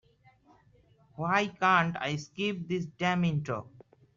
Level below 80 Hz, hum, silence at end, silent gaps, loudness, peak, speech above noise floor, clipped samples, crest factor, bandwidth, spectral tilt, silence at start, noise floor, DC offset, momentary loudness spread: -68 dBFS; none; 0.5 s; none; -30 LUFS; -10 dBFS; 33 dB; under 0.1%; 20 dB; 7.4 kHz; -4 dB/octave; 1.15 s; -63 dBFS; under 0.1%; 11 LU